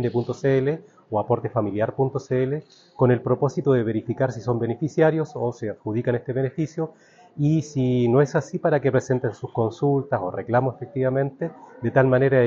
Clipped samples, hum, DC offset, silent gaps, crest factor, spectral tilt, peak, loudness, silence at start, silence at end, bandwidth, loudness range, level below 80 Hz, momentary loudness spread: under 0.1%; none; under 0.1%; none; 18 dB; -8 dB/octave; -4 dBFS; -23 LUFS; 0 s; 0 s; 7.6 kHz; 2 LU; -58 dBFS; 8 LU